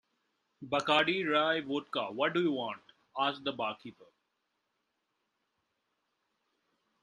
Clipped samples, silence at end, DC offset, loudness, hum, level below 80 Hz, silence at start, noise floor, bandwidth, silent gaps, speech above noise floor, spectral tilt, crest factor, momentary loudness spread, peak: under 0.1%; 3 s; under 0.1%; -32 LUFS; none; -78 dBFS; 0.6 s; -82 dBFS; 11 kHz; none; 50 dB; -4.5 dB/octave; 24 dB; 16 LU; -12 dBFS